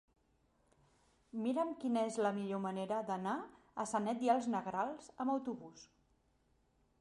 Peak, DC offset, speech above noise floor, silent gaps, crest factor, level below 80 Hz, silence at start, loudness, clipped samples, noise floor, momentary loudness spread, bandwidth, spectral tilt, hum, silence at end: -20 dBFS; under 0.1%; 38 dB; none; 20 dB; -78 dBFS; 1.35 s; -38 LUFS; under 0.1%; -75 dBFS; 10 LU; 11.5 kHz; -5.5 dB/octave; none; 1.15 s